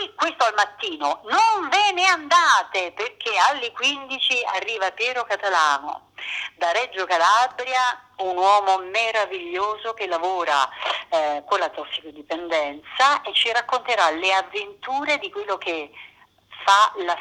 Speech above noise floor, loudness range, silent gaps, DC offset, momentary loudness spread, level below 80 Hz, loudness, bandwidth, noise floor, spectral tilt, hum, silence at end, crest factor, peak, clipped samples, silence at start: 25 dB; 4 LU; none; under 0.1%; 11 LU; -70 dBFS; -21 LUFS; 13 kHz; -47 dBFS; 0 dB/octave; none; 0 s; 20 dB; -2 dBFS; under 0.1%; 0 s